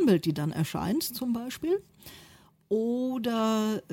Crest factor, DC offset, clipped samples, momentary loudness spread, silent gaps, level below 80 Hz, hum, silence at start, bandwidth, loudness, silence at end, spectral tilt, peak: 16 dB; under 0.1%; under 0.1%; 6 LU; none; -62 dBFS; none; 0 s; 17 kHz; -29 LUFS; 0 s; -6 dB/octave; -12 dBFS